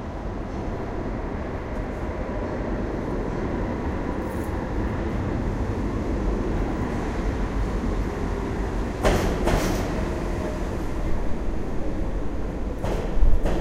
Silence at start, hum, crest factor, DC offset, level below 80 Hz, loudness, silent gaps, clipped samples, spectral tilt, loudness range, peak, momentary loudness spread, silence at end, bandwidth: 0 s; none; 20 dB; under 0.1%; -28 dBFS; -28 LUFS; none; under 0.1%; -7 dB/octave; 4 LU; -4 dBFS; 7 LU; 0 s; 16 kHz